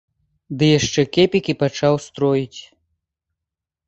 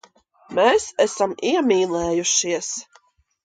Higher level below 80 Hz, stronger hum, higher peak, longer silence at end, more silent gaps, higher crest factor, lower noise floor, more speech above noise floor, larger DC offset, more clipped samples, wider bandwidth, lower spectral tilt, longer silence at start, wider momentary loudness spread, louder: about the same, -52 dBFS vs -54 dBFS; neither; about the same, -2 dBFS vs -4 dBFS; first, 1.25 s vs 0.65 s; neither; about the same, 18 dB vs 18 dB; first, -85 dBFS vs -58 dBFS; first, 67 dB vs 38 dB; neither; neither; second, 8.4 kHz vs 10 kHz; first, -5.5 dB/octave vs -2.5 dB/octave; about the same, 0.5 s vs 0.5 s; first, 13 LU vs 9 LU; about the same, -18 LUFS vs -20 LUFS